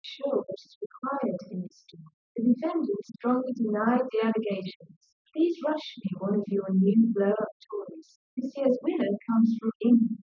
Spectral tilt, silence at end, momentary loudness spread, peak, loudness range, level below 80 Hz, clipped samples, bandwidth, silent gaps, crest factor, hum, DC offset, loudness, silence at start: -8.5 dB/octave; 0.05 s; 15 LU; -12 dBFS; 4 LU; -80 dBFS; under 0.1%; 6.4 kHz; 0.76-0.90 s, 2.13-2.35 s, 4.76-4.80 s, 4.96-5.01 s, 5.12-5.25 s, 7.52-7.60 s, 8.16-8.37 s, 9.75-9.80 s; 16 dB; none; under 0.1%; -28 LUFS; 0.05 s